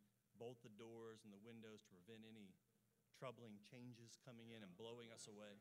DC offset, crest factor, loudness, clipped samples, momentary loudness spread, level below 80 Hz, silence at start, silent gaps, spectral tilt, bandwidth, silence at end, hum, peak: under 0.1%; 20 dB; -61 LUFS; under 0.1%; 6 LU; under -90 dBFS; 0 s; none; -4.5 dB/octave; 15.5 kHz; 0 s; none; -42 dBFS